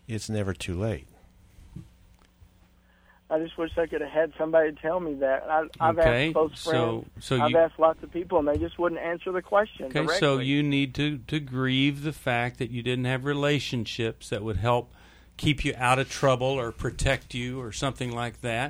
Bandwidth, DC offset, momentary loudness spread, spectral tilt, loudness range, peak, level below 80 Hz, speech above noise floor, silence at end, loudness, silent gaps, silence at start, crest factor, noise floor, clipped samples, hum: over 20 kHz; under 0.1%; 8 LU; -5.5 dB/octave; 6 LU; -6 dBFS; -46 dBFS; 33 dB; 0 s; -27 LUFS; none; 0.1 s; 20 dB; -59 dBFS; under 0.1%; none